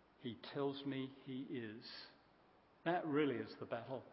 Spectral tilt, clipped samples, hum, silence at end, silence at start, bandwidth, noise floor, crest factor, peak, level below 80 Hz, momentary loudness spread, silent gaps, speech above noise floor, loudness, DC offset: -4.5 dB/octave; under 0.1%; none; 0 s; 0.2 s; 5.6 kHz; -70 dBFS; 22 dB; -24 dBFS; -84 dBFS; 13 LU; none; 27 dB; -44 LUFS; under 0.1%